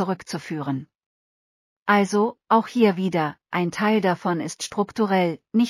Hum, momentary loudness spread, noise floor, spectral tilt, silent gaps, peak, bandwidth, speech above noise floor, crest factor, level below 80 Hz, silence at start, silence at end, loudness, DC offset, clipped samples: none; 10 LU; under -90 dBFS; -5.5 dB/octave; 1.06-1.86 s; -4 dBFS; 15 kHz; over 68 dB; 18 dB; -68 dBFS; 0 s; 0 s; -23 LUFS; under 0.1%; under 0.1%